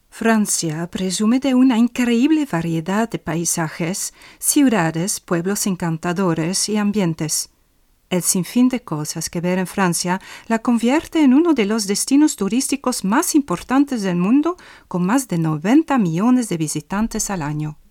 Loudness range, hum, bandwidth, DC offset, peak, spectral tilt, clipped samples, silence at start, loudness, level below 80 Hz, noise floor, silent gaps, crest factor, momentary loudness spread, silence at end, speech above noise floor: 3 LU; none; 17.5 kHz; under 0.1%; -2 dBFS; -4.5 dB/octave; under 0.1%; 0.15 s; -19 LUFS; -50 dBFS; -59 dBFS; none; 16 dB; 8 LU; 0.15 s; 40 dB